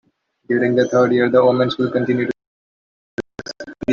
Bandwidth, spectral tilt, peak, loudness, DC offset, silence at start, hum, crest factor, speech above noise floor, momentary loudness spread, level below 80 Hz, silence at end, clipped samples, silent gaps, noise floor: 7.2 kHz; -6.5 dB/octave; -2 dBFS; -17 LUFS; under 0.1%; 0.5 s; none; 16 dB; over 74 dB; 18 LU; -58 dBFS; 0 s; under 0.1%; 2.47-3.18 s; under -90 dBFS